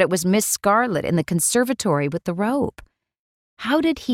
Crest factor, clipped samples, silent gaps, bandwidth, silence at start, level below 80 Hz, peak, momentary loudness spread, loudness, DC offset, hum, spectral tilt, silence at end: 16 dB; under 0.1%; 3.19-3.57 s; 17.5 kHz; 0 s; -52 dBFS; -4 dBFS; 6 LU; -20 LUFS; under 0.1%; none; -4.5 dB/octave; 0 s